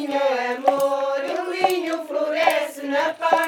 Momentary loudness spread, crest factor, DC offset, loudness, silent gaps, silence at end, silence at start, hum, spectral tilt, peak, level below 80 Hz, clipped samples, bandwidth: 5 LU; 20 dB; under 0.1%; -22 LUFS; none; 0 s; 0 s; none; -2.5 dB/octave; -2 dBFS; -80 dBFS; under 0.1%; 19.5 kHz